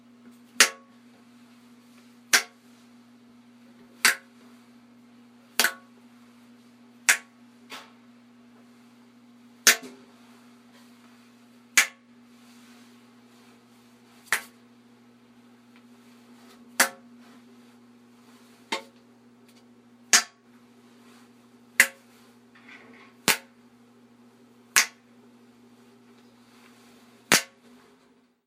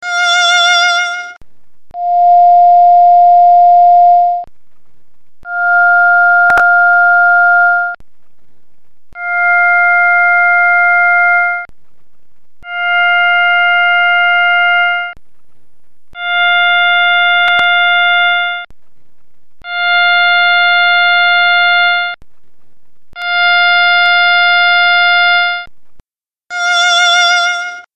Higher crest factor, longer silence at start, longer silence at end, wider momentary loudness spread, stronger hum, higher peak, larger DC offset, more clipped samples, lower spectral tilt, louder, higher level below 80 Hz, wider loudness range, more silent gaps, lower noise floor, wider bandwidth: first, 32 dB vs 10 dB; first, 0.6 s vs 0 s; first, 1.05 s vs 0 s; first, 24 LU vs 12 LU; neither; about the same, 0 dBFS vs 0 dBFS; second, under 0.1% vs 3%; neither; about the same, 1 dB/octave vs 1.5 dB/octave; second, -23 LUFS vs -8 LUFS; second, -78 dBFS vs -54 dBFS; first, 6 LU vs 3 LU; neither; second, -62 dBFS vs under -90 dBFS; first, 16 kHz vs 9 kHz